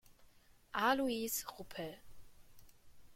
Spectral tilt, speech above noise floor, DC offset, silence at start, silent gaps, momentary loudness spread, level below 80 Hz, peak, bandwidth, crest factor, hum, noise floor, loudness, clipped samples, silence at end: -2.5 dB/octave; 27 dB; under 0.1%; 0.1 s; none; 15 LU; -68 dBFS; -20 dBFS; 16.5 kHz; 22 dB; none; -65 dBFS; -38 LUFS; under 0.1%; 0 s